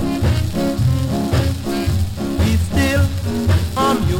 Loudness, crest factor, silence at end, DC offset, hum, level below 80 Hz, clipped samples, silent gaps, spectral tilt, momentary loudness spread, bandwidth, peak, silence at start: -18 LUFS; 12 dB; 0 s; under 0.1%; none; -26 dBFS; under 0.1%; none; -6.5 dB/octave; 4 LU; 17 kHz; -6 dBFS; 0 s